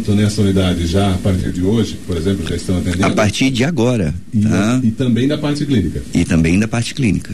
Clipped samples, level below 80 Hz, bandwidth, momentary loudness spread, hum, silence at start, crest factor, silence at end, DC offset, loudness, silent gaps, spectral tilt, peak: under 0.1%; -32 dBFS; 13.5 kHz; 5 LU; none; 0 s; 12 dB; 0 s; 3%; -16 LUFS; none; -6 dB/octave; -2 dBFS